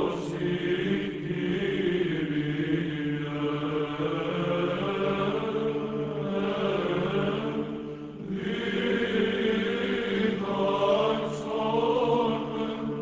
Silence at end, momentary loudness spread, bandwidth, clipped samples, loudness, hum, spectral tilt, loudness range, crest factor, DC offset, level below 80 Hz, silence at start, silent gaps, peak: 0 s; 6 LU; 8 kHz; under 0.1%; -28 LUFS; none; -7 dB/octave; 3 LU; 16 dB; under 0.1%; -56 dBFS; 0 s; none; -12 dBFS